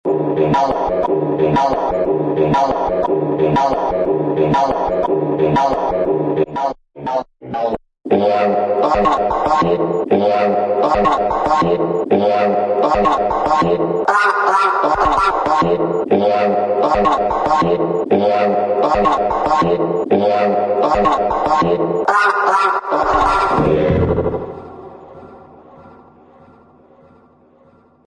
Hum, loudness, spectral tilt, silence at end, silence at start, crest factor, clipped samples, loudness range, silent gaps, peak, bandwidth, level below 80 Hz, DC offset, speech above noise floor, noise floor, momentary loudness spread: none; -15 LUFS; -7 dB/octave; 2.2 s; 0.05 s; 14 dB; under 0.1%; 4 LU; none; 0 dBFS; 10 kHz; -38 dBFS; under 0.1%; 35 dB; -50 dBFS; 4 LU